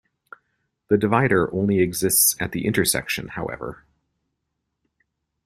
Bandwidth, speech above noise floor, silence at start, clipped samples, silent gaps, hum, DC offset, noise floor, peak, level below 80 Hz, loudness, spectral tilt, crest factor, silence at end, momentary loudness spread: 16 kHz; 57 dB; 0.9 s; under 0.1%; none; none; under 0.1%; -78 dBFS; -4 dBFS; -52 dBFS; -20 LUFS; -4 dB/octave; 20 dB; 1.7 s; 14 LU